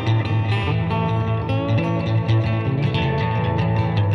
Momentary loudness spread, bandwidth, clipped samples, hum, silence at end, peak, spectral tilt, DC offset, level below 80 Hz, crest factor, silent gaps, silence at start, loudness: 2 LU; 6.2 kHz; under 0.1%; none; 0 s; -8 dBFS; -8.5 dB/octave; under 0.1%; -40 dBFS; 10 dB; none; 0 s; -21 LUFS